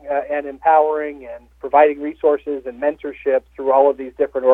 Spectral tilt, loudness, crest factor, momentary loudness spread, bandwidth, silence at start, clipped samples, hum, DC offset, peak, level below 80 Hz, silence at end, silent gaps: -7 dB/octave; -18 LUFS; 18 dB; 12 LU; 3.9 kHz; 0.05 s; under 0.1%; none; under 0.1%; 0 dBFS; -54 dBFS; 0 s; none